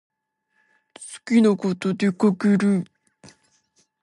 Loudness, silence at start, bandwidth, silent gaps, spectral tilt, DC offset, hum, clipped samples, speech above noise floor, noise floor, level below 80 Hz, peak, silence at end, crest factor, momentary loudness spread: -21 LUFS; 1 s; 11.5 kHz; none; -7 dB/octave; under 0.1%; none; under 0.1%; 53 dB; -72 dBFS; -70 dBFS; -8 dBFS; 1.2 s; 16 dB; 20 LU